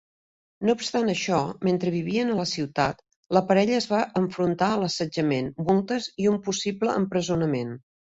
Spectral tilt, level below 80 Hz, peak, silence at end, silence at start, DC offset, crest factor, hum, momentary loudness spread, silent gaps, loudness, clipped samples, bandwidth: -5.5 dB/octave; -60 dBFS; -6 dBFS; 0.35 s; 0.6 s; under 0.1%; 20 dB; none; 5 LU; 3.16-3.23 s; -25 LUFS; under 0.1%; 8 kHz